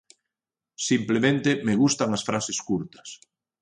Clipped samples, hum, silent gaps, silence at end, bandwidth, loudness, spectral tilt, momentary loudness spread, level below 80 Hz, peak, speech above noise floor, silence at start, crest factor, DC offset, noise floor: under 0.1%; none; none; 0.45 s; 10.5 kHz; -24 LUFS; -4.5 dB/octave; 13 LU; -62 dBFS; -8 dBFS; 66 dB; 0.8 s; 18 dB; under 0.1%; -90 dBFS